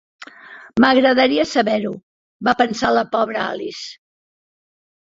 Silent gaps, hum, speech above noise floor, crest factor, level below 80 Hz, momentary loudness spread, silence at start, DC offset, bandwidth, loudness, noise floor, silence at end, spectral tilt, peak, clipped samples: 2.03-2.40 s; none; 24 dB; 18 dB; -56 dBFS; 17 LU; 0.2 s; under 0.1%; 7.8 kHz; -17 LUFS; -41 dBFS; 1.15 s; -4.5 dB/octave; -2 dBFS; under 0.1%